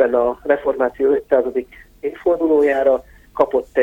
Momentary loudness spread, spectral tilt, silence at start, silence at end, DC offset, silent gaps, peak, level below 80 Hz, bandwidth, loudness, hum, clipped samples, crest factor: 10 LU; -7 dB/octave; 0 s; 0 s; under 0.1%; none; -2 dBFS; -48 dBFS; 17 kHz; -18 LUFS; none; under 0.1%; 14 dB